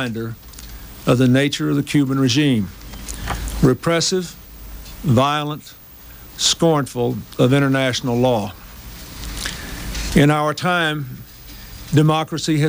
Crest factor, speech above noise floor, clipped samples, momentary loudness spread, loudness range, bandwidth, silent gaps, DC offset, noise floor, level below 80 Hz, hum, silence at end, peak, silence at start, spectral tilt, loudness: 18 dB; 23 dB; under 0.1%; 21 LU; 2 LU; 16.5 kHz; none; under 0.1%; -40 dBFS; -36 dBFS; none; 0 s; -2 dBFS; 0 s; -5 dB/octave; -18 LUFS